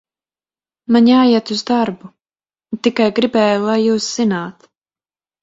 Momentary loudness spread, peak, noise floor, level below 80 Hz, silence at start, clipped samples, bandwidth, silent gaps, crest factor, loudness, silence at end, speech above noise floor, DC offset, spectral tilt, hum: 16 LU; 0 dBFS; under -90 dBFS; -60 dBFS; 0.9 s; under 0.1%; 7.8 kHz; none; 16 dB; -15 LUFS; 0.9 s; over 76 dB; under 0.1%; -5 dB/octave; none